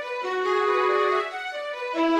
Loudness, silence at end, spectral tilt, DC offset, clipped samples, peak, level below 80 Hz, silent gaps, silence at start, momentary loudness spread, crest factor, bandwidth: -25 LUFS; 0 s; -2.5 dB/octave; under 0.1%; under 0.1%; -12 dBFS; -70 dBFS; none; 0 s; 9 LU; 14 dB; 11 kHz